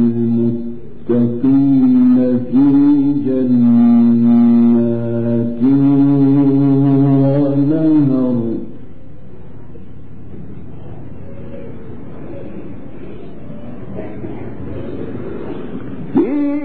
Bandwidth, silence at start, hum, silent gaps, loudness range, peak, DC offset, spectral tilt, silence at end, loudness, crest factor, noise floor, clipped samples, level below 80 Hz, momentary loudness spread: 4.3 kHz; 0 s; none; none; 21 LU; -4 dBFS; 5%; -13.5 dB/octave; 0 s; -13 LUFS; 10 dB; -37 dBFS; under 0.1%; -44 dBFS; 22 LU